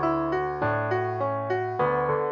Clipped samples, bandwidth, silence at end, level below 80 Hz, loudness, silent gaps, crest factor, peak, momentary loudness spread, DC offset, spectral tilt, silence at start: under 0.1%; 6.8 kHz; 0 s; -54 dBFS; -26 LUFS; none; 14 dB; -12 dBFS; 3 LU; under 0.1%; -9 dB/octave; 0 s